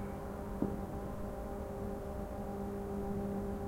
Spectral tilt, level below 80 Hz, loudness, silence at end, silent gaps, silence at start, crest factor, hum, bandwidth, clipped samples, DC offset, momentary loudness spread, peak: -8 dB/octave; -48 dBFS; -41 LUFS; 0 s; none; 0 s; 20 dB; none; 16.5 kHz; under 0.1%; under 0.1%; 4 LU; -20 dBFS